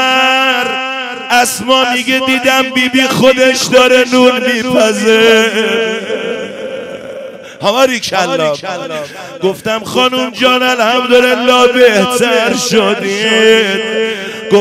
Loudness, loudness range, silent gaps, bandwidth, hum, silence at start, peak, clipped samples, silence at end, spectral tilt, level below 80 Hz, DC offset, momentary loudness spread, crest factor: -10 LUFS; 6 LU; none; 16 kHz; none; 0 s; 0 dBFS; 0.3%; 0 s; -3 dB/octave; -52 dBFS; under 0.1%; 13 LU; 10 dB